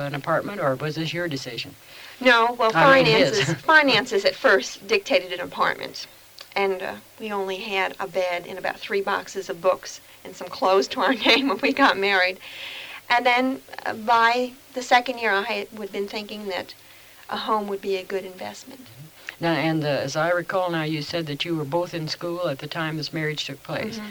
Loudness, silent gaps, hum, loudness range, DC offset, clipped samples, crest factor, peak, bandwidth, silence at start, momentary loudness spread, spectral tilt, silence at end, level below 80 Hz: -22 LUFS; none; none; 9 LU; under 0.1%; under 0.1%; 22 dB; -2 dBFS; over 20 kHz; 0 s; 16 LU; -4 dB/octave; 0 s; -62 dBFS